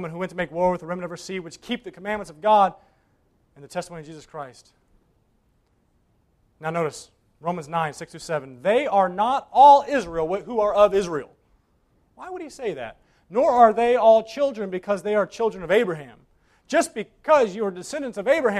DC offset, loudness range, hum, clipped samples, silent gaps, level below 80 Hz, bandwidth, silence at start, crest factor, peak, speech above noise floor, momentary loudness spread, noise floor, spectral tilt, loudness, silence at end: under 0.1%; 16 LU; none; under 0.1%; none; -56 dBFS; 13 kHz; 0 s; 20 dB; -2 dBFS; 43 dB; 19 LU; -65 dBFS; -5 dB/octave; -22 LUFS; 0 s